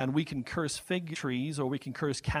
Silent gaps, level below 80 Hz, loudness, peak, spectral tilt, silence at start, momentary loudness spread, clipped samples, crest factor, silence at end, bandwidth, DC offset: none; -52 dBFS; -33 LUFS; -14 dBFS; -5 dB/octave; 0 s; 3 LU; under 0.1%; 18 dB; 0 s; 15.5 kHz; under 0.1%